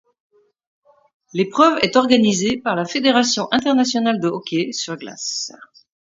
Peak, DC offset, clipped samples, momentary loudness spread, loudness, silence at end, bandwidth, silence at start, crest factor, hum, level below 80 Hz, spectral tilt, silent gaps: 0 dBFS; under 0.1%; under 0.1%; 11 LU; -18 LUFS; 0.4 s; 7.8 kHz; 1.35 s; 20 dB; none; -60 dBFS; -3.5 dB/octave; none